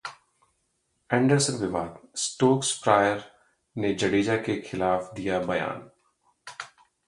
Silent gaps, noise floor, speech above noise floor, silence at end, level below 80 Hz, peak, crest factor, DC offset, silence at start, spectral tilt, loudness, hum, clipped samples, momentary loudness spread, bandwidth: none; -74 dBFS; 49 dB; 0.4 s; -58 dBFS; -4 dBFS; 22 dB; under 0.1%; 0.05 s; -4.5 dB/octave; -26 LUFS; none; under 0.1%; 19 LU; 11.5 kHz